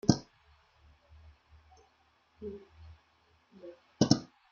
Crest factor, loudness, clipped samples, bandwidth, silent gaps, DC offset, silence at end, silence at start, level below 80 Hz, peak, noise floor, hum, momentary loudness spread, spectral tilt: 30 dB; -32 LUFS; under 0.1%; 7.4 kHz; none; under 0.1%; 0.25 s; 0.05 s; -62 dBFS; -6 dBFS; -70 dBFS; none; 28 LU; -6 dB/octave